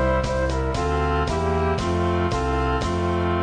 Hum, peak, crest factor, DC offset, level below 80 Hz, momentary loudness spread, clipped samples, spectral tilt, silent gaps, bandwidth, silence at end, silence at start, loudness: none; -10 dBFS; 10 dB; 0.2%; -30 dBFS; 1 LU; under 0.1%; -6.5 dB/octave; none; 10.5 kHz; 0 s; 0 s; -23 LUFS